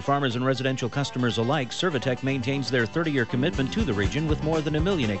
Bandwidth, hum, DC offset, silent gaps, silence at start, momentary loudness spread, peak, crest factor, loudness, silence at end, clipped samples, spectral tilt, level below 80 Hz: 8.2 kHz; none; 0.6%; none; 0 s; 2 LU; -10 dBFS; 14 dB; -25 LUFS; 0 s; under 0.1%; -6 dB/octave; -40 dBFS